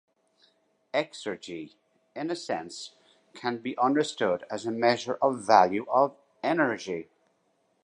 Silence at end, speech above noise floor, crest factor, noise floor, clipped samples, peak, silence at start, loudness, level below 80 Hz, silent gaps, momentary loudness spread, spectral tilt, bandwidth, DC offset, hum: 0.8 s; 44 dB; 24 dB; -71 dBFS; under 0.1%; -4 dBFS; 0.95 s; -28 LUFS; -74 dBFS; none; 19 LU; -4.5 dB/octave; 10.5 kHz; under 0.1%; none